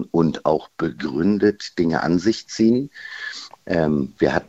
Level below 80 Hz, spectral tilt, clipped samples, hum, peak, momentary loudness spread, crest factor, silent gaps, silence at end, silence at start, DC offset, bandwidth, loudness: -50 dBFS; -6.5 dB/octave; under 0.1%; none; -2 dBFS; 12 LU; 18 dB; none; 0.05 s; 0 s; under 0.1%; 8 kHz; -21 LUFS